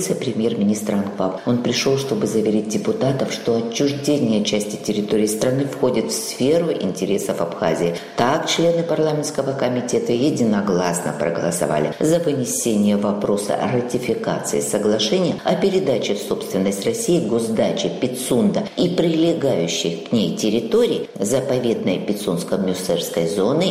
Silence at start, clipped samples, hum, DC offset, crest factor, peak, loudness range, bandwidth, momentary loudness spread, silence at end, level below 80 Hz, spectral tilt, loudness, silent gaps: 0 s; under 0.1%; none; under 0.1%; 18 dB; -2 dBFS; 1 LU; 16 kHz; 4 LU; 0 s; -56 dBFS; -5 dB/octave; -20 LUFS; none